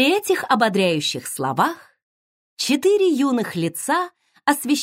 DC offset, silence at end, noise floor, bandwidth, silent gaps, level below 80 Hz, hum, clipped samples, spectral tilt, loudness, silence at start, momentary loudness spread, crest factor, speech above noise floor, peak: under 0.1%; 0 s; under -90 dBFS; 16 kHz; 2.03-2.57 s; -72 dBFS; none; under 0.1%; -4 dB/octave; -20 LUFS; 0 s; 7 LU; 18 dB; over 70 dB; -2 dBFS